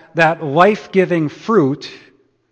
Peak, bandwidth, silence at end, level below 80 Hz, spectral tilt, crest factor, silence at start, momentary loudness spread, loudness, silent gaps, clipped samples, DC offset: 0 dBFS; 8.8 kHz; 0.55 s; -58 dBFS; -7 dB/octave; 16 dB; 0.15 s; 8 LU; -15 LUFS; none; under 0.1%; under 0.1%